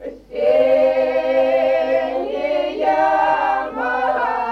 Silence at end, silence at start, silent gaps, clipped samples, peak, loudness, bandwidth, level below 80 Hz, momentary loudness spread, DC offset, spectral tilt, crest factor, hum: 0 s; 0 s; none; under 0.1%; -6 dBFS; -18 LUFS; 6.6 kHz; -52 dBFS; 6 LU; under 0.1%; -5 dB/octave; 12 dB; none